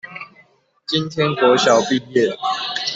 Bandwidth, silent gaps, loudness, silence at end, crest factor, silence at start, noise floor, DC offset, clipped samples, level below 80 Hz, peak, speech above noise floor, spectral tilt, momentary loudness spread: 8 kHz; none; -17 LUFS; 0 s; 16 dB; 0.05 s; -54 dBFS; under 0.1%; under 0.1%; -62 dBFS; -2 dBFS; 38 dB; -4 dB/octave; 20 LU